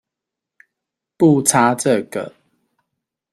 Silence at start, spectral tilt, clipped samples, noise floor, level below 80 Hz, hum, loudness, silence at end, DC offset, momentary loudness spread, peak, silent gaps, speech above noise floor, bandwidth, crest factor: 1.2 s; -5 dB/octave; under 0.1%; -84 dBFS; -62 dBFS; none; -16 LUFS; 1.05 s; under 0.1%; 15 LU; 0 dBFS; none; 69 dB; 16 kHz; 20 dB